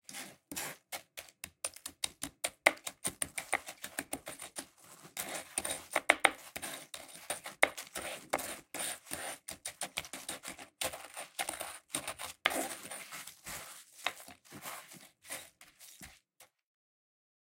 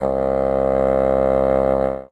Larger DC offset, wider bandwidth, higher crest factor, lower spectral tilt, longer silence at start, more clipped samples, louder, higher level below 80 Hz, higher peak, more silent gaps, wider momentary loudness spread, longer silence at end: neither; first, 17 kHz vs 7.8 kHz; first, 38 dB vs 12 dB; second, -0.5 dB/octave vs -9 dB/octave; about the same, 0.1 s vs 0 s; neither; second, -38 LUFS vs -18 LUFS; second, -72 dBFS vs -34 dBFS; about the same, -4 dBFS vs -4 dBFS; neither; first, 17 LU vs 3 LU; first, 1.05 s vs 0.05 s